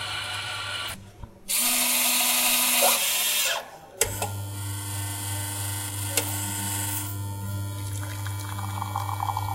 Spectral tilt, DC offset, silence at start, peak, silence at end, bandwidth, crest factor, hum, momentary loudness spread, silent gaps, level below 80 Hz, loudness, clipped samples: -1.5 dB/octave; under 0.1%; 0 s; -2 dBFS; 0 s; 16 kHz; 26 dB; none; 13 LU; none; -54 dBFS; -25 LUFS; under 0.1%